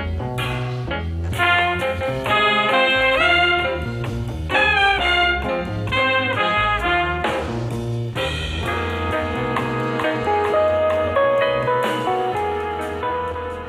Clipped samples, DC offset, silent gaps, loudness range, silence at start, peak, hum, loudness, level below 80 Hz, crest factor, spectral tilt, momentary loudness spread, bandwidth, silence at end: under 0.1%; under 0.1%; none; 5 LU; 0 s; -4 dBFS; none; -19 LUFS; -36 dBFS; 16 dB; -5.5 dB/octave; 10 LU; 15.5 kHz; 0 s